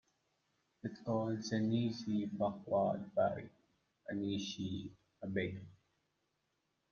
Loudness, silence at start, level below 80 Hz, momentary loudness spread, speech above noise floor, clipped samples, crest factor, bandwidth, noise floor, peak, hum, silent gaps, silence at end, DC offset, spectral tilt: -39 LUFS; 0.85 s; -76 dBFS; 13 LU; 46 dB; under 0.1%; 18 dB; 7 kHz; -83 dBFS; -22 dBFS; none; none; 1.15 s; under 0.1%; -6.5 dB/octave